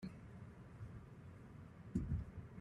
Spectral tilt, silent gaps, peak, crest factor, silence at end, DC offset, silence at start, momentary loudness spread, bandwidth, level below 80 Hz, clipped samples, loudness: -8.5 dB/octave; none; -26 dBFS; 22 dB; 0 s; under 0.1%; 0 s; 14 LU; 11 kHz; -56 dBFS; under 0.1%; -50 LUFS